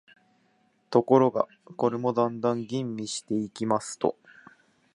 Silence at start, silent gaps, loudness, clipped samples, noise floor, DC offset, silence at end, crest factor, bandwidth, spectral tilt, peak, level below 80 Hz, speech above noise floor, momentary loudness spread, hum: 0.9 s; none; -27 LUFS; under 0.1%; -67 dBFS; under 0.1%; 0.85 s; 22 dB; 11 kHz; -6 dB/octave; -6 dBFS; -72 dBFS; 41 dB; 10 LU; none